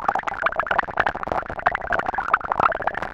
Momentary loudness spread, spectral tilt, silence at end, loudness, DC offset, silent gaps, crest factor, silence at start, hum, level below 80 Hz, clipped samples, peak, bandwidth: 4 LU; -5 dB/octave; 0 s; -23 LUFS; under 0.1%; none; 20 dB; 0 s; none; -44 dBFS; under 0.1%; -2 dBFS; 11 kHz